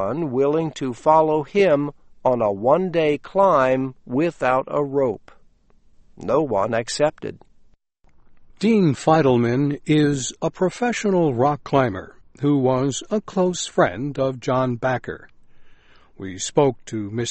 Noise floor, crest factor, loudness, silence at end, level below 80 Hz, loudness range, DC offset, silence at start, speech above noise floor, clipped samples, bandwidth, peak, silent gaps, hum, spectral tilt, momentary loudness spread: -54 dBFS; 18 dB; -20 LUFS; 0 s; -54 dBFS; 5 LU; under 0.1%; 0 s; 34 dB; under 0.1%; 8.8 kHz; -2 dBFS; none; none; -6 dB/octave; 9 LU